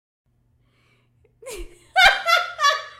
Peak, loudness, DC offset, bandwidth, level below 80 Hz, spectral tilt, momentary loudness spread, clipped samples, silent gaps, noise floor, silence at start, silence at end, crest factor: 0 dBFS; -17 LUFS; under 0.1%; 16 kHz; -48 dBFS; 0.5 dB/octave; 23 LU; under 0.1%; none; -63 dBFS; 1.45 s; 0.1 s; 22 dB